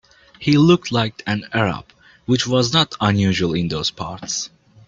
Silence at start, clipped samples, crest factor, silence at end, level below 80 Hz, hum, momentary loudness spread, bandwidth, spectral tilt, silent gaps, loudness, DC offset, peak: 0.4 s; under 0.1%; 18 dB; 0.4 s; -50 dBFS; none; 11 LU; 9 kHz; -5 dB/octave; none; -19 LUFS; under 0.1%; 0 dBFS